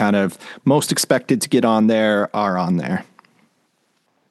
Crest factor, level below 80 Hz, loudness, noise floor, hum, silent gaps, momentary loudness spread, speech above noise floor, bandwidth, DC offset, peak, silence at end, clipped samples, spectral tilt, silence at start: 18 dB; -66 dBFS; -18 LUFS; -66 dBFS; none; none; 8 LU; 48 dB; 12.5 kHz; under 0.1%; -2 dBFS; 1.3 s; under 0.1%; -5 dB/octave; 0 s